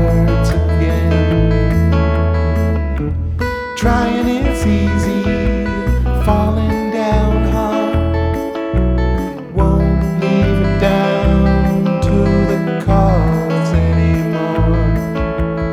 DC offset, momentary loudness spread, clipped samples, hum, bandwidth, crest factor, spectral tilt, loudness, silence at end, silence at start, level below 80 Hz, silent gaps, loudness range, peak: under 0.1%; 5 LU; under 0.1%; none; 13 kHz; 12 dB; -8 dB/octave; -15 LUFS; 0 s; 0 s; -20 dBFS; none; 2 LU; -2 dBFS